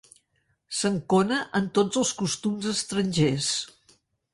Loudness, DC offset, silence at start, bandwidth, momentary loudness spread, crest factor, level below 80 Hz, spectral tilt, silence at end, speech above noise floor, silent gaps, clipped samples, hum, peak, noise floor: -25 LUFS; under 0.1%; 0.7 s; 11.5 kHz; 5 LU; 16 dB; -60 dBFS; -4 dB/octave; 0.7 s; 47 dB; none; under 0.1%; none; -10 dBFS; -72 dBFS